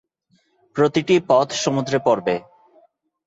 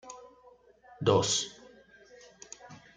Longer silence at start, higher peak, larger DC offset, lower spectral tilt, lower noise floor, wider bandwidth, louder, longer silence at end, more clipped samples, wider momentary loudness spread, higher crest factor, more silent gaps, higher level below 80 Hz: first, 0.75 s vs 0.05 s; first, -2 dBFS vs -10 dBFS; neither; first, -5 dB/octave vs -3.5 dB/octave; first, -64 dBFS vs -59 dBFS; second, 8 kHz vs 9.8 kHz; first, -19 LUFS vs -28 LUFS; first, 0.85 s vs 0.2 s; neither; second, 9 LU vs 23 LU; second, 18 dB vs 24 dB; neither; about the same, -62 dBFS vs -66 dBFS